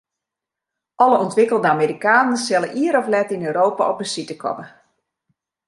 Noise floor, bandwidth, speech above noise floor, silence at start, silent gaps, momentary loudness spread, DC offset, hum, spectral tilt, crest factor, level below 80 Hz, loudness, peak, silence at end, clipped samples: -85 dBFS; 11.5 kHz; 67 dB; 1 s; none; 10 LU; under 0.1%; none; -4.5 dB/octave; 18 dB; -70 dBFS; -18 LUFS; -2 dBFS; 1 s; under 0.1%